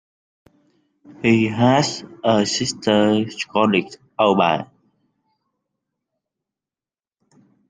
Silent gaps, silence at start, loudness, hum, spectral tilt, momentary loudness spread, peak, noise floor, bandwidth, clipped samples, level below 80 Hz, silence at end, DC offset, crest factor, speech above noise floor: none; 1.2 s; -19 LUFS; none; -5 dB/octave; 8 LU; -2 dBFS; under -90 dBFS; 9.8 kHz; under 0.1%; -60 dBFS; 3.05 s; under 0.1%; 20 dB; over 72 dB